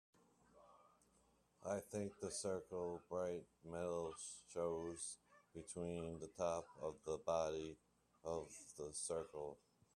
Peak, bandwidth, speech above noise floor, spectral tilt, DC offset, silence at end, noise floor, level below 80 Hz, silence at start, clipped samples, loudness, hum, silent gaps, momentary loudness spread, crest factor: -26 dBFS; 13.5 kHz; 30 dB; -4.5 dB/octave; under 0.1%; 0.4 s; -77 dBFS; -76 dBFS; 0.55 s; under 0.1%; -47 LUFS; none; none; 10 LU; 22 dB